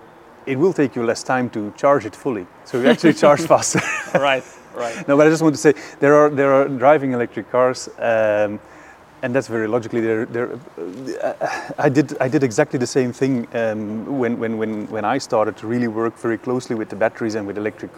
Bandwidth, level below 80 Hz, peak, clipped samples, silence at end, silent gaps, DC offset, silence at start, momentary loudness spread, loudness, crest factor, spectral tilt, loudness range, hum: 16 kHz; -62 dBFS; 0 dBFS; under 0.1%; 0 s; none; under 0.1%; 0.45 s; 11 LU; -19 LUFS; 18 dB; -5.5 dB/octave; 6 LU; none